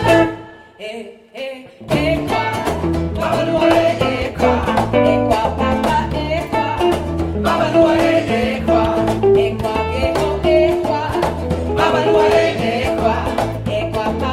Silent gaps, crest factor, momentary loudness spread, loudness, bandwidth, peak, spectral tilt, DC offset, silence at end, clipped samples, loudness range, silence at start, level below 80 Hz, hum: none; 16 dB; 8 LU; -16 LUFS; 15.5 kHz; -2 dBFS; -6.5 dB/octave; under 0.1%; 0 s; under 0.1%; 2 LU; 0 s; -34 dBFS; none